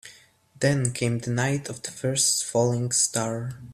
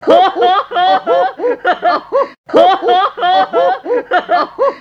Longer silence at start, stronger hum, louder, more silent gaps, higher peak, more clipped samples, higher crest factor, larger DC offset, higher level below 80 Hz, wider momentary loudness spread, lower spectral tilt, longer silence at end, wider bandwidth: about the same, 0.05 s vs 0 s; neither; second, -24 LUFS vs -12 LUFS; second, none vs 2.38-2.44 s; second, -8 dBFS vs 0 dBFS; neither; first, 18 dB vs 12 dB; neither; about the same, -58 dBFS vs -58 dBFS; first, 9 LU vs 6 LU; about the same, -4 dB/octave vs -4.5 dB/octave; about the same, 0 s vs 0 s; first, 15 kHz vs 7.2 kHz